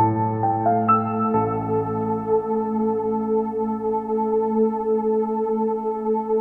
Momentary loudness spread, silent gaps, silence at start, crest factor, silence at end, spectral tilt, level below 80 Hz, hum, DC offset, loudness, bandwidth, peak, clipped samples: 4 LU; none; 0 s; 14 dB; 0 s; -11.5 dB/octave; -56 dBFS; none; under 0.1%; -22 LUFS; 2.9 kHz; -8 dBFS; under 0.1%